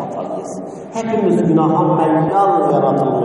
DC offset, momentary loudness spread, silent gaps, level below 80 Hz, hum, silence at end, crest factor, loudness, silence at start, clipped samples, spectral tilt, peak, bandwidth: under 0.1%; 12 LU; none; -58 dBFS; none; 0 s; 12 dB; -15 LUFS; 0 s; under 0.1%; -8 dB/octave; -2 dBFS; 11 kHz